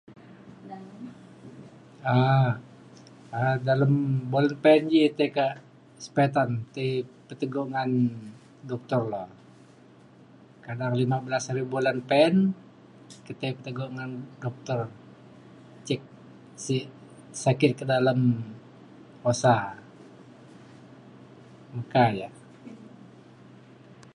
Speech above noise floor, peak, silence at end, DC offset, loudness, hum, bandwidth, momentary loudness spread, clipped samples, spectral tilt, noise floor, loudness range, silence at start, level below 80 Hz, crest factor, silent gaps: 28 dB; -6 dBFS; 1.05 s; under 0.1%; -26 LUFS; none; 10.5 kHz; 23 LU; under 0.1%; -6.5 dB/octave; -53 dBFS; 9 LU; 0.1 s; -68 dBFS; 22 dB; none